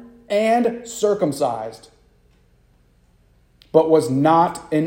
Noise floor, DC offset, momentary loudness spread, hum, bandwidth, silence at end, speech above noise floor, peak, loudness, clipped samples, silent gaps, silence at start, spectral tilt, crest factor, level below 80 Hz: -56 dBFS; under 0.1%; 8 LU; none; 16.5 kHz; 0 s; 38 dB; -2 dBFS; -19 LUFS; under 0.1%; none; 0 s; -6 dB/octave; 20 dB; -58 dBFS